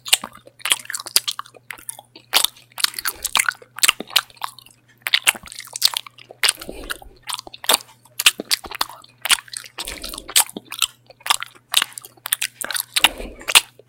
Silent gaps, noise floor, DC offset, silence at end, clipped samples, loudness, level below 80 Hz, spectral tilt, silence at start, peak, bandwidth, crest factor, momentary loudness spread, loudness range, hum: none; -49 dBFS; under 0.1%; 0.25 s; under 0.1%; -19 LUFS; -50 dBFS; 1.5 dB/octave; 0.05 s; 0 dBFS; over 20 kHz; 24 dB; 16 LU; 2 LU; none